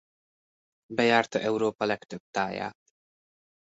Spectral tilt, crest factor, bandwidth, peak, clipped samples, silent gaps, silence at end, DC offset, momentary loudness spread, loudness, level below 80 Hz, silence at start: -4.5 dB/octave; 24 dB; 8 kHz; -6 dBFS; under 0.1%; 2.20-2.33 s; 0.95 s; under 0.1%; 12 LU; -28 LUFS; -70 dBFS; 0.9 s